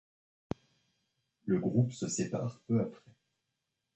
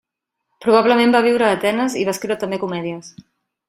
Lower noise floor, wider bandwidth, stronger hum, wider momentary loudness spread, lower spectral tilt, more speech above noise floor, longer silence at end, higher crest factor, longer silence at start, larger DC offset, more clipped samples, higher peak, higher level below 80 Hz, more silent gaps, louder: first, -85 dBFS vs -77 dBFS; second, 8.4 kHz vs 16 kHz; neither; first, 14 LU vs 11 LU; first, -6.5 dB/octave vs -4.5 dB/octave; second, 53 dB vs 60 dB; first, 1 s vs 0.6 s; first, 22 dB vs 16 dB; first, 1.45 s vs 0.6 s; neither; neither; second, -14 dBFS vs -2 dBFS; about the same, -66 dBFS vs -62 dBFS; neither; second, -33 LUFS vs -17 LUFS